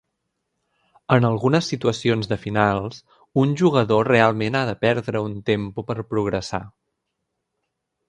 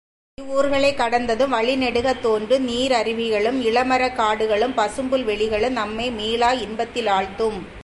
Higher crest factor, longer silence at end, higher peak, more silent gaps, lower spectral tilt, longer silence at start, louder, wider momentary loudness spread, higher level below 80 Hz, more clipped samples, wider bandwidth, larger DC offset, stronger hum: first, 22 dB vs 14 dB; first, 1.4 s vs 0 s; first, 0 dBFS vs -6 dBFS; neither; first, -6.5 dB/octave vs -4 dB/octave; first, 1.1 s vs 0.4 s; about the same, -21 LUFS vs -21 LUFS; first, 10 LU vs 5 LU; second, -52 dBFS vs -46 dBFS; neither; second, 10 kHz vs 11.5 kHz; neither; neither